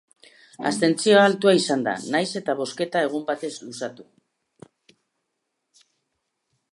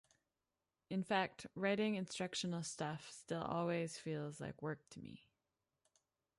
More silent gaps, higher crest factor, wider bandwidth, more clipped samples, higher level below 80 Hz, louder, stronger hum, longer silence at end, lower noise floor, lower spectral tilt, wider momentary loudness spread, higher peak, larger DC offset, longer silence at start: neither; about the same, 22 dB vs 20 dB; about the same, 11.5 kHz vs 11.5 kHz; neither; about the same, -76 dBFS vs -78 dBFS; first, -22 LUFS vs -42 LUFS; neither; first, 2.7 s vs 1.2 s; second, -78 dBFS vs under -90 dBFS; about the same, -4 dB/octave vs -5 dB/octave; first, 16 LU vs 12 LU; first, -4 dBFS vs -24 dBFS; neither; second, 0.6 s vs 0.9 s